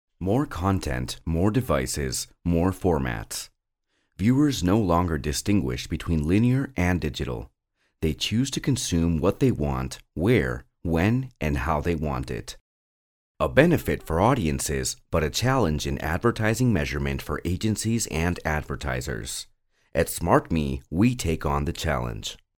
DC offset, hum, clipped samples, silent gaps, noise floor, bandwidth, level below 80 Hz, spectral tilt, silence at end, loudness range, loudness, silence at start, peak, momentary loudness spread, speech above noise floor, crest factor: under 0.1%; none; under 0.1%; 12.61-13.35 s; -75 dBFS; 18.5 kHz; -38 dBFS; -5.5 dB/octave; 0.2 s; 3 LU; -25 LUFS; 0.2 s; -2 dBFS; 9 LU; 51 dB; 22 dB